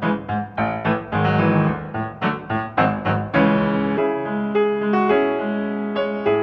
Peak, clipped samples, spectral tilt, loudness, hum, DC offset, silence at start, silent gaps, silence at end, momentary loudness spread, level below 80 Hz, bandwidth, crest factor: -4 dBFS; under 0.1%; -9.5 dB/octave; -21 LUFS; none; under 0.1%; 0 s; none; 0 s; 7 LU; -50 dBFS; 5.8 kHz; 16 dB